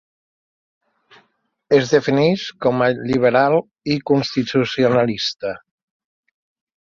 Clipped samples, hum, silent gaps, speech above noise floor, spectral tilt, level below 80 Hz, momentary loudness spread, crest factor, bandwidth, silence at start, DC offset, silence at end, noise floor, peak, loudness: under 0.1%; none; none; 45 dB; -6 dB/octave; -56 dBFS; 8 LU; 18 dB; 7.4 kHz; 1.7 s; under 0.1%; 1.25 s; -63 dBFS; -2 dBFS; -18 LUFS